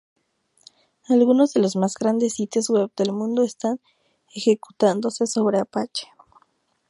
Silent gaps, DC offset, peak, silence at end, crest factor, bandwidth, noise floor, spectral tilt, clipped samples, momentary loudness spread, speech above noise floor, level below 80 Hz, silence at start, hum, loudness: none; under 0.1%; -4 dBFS; 0.85 s; 18 dB; 11.5 kHz; -65 dBFS; -5 dB/octave; under 0.1%; 10 LU; 45 dB; -72 dBFS; 1.1 s; none; -22 LUFS